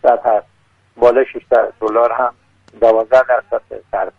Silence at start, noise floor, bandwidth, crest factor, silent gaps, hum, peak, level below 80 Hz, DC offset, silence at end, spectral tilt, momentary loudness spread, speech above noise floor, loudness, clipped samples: 0.05 s; -43 dBFS; 7 kHz; 14 dB; none; none; 0 dBFS; -50 dBFS; under 0.1%; 0.1 s; -6 dB/octave; 9 LU; 29 dB; -15 LUFS; under 0.1%